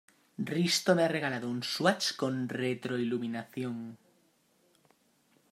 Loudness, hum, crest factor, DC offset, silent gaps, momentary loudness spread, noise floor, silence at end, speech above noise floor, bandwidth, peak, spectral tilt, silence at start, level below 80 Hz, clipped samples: -31 LUFS; none; 22 dB; under 0.1%; none; 12 LU; -69 dBFS; 1.55 s; 38 dB; 16 kHz; -10 dBFS; -4.5 dB/octave; 0.4 s; -80 dBFS; under 0.1%